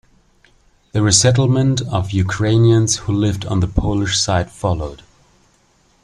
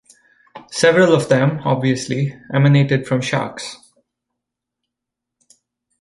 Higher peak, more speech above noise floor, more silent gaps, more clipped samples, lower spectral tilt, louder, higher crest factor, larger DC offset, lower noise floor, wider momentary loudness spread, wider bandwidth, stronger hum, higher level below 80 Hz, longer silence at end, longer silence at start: about the same, 0 dBFS vs -2 dBFS; second, 41 dB vs 67 dB; neither; neither; second, -4.5 dB/octave vs -6 dB/octave; about the same, -16 LUFS vs -16 LUFS; about the same, 18 dB vs 18 dB; neither; second, -56 dBFS vs -82 dBFS; second, 9 LU vs 13 LU; about the same, 11.5 kHz vs 11.5 kHz; neither; first, -36 dBFS vs -58 dBFS; second, 1.1 s vs 2.25 s; first, 0.95 s vs 0.55 s